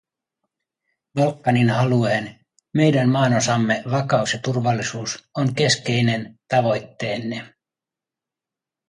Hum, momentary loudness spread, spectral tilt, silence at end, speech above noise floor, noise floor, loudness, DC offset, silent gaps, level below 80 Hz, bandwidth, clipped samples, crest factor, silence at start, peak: none; 10 LU; -5.5 dB/octave; 1.4 s; 68 dB; -88 dBFS; -21 LUFS; under 0.1%; none; -60 dBFS; 11.5 kHz; under 0.1%; 18 dB; 1.15 s; -4 dBFS